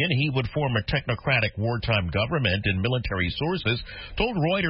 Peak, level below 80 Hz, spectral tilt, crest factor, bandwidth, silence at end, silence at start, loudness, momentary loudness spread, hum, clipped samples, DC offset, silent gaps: -8 dBFS; -40 dBFS; -10.5 dB/octave; 16 dB; 5.8 kHz; 0 s; 0 s; -25 LUFS; 4 LU; none; under 0.1%; under 0.1%; none